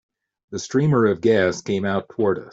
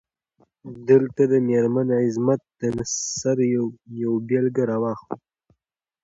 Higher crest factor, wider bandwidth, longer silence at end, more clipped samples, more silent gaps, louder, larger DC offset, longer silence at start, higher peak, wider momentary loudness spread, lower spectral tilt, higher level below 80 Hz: about the same, 16 dB vs 18 dB; about the same, 7.8 kHz vs 8 kHz; second, 0 s vs 0.9 s; neither; neither; about the same, -20 LUFS vs -22 LUFS; neither; second, 0.5 s vs 0.65 s; about the same, -6 dBFS vs -4 dBFS; second, 8 LU vs 12 LU; about the same, -6.5 dB/octave vs -6 dB/octave; about the same, -60 dBFS vs -60 dBFS